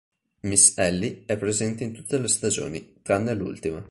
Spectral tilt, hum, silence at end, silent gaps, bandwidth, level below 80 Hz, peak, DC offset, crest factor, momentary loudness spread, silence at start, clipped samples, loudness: -3.5 dB/octave; none; 0.05 s; none; 11.5 kHz; -52 dBFS; -2 dBFS; under 0.1%; 22 dB; 16 LU; 0.45 s; under 0.1%; -23 LUFS